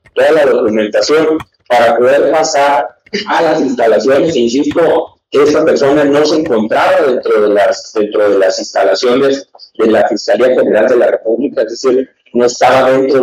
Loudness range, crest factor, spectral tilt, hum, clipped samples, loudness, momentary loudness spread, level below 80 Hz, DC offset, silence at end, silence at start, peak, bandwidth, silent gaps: 1 LU; 10 dB; -4 dB/octave; none; under 0.1%; -11 LUFS; 6 LU; -52 dBFS; under 0.1%; 0 s; 0.15 s; 0 dBFS; 13.5 kHz; none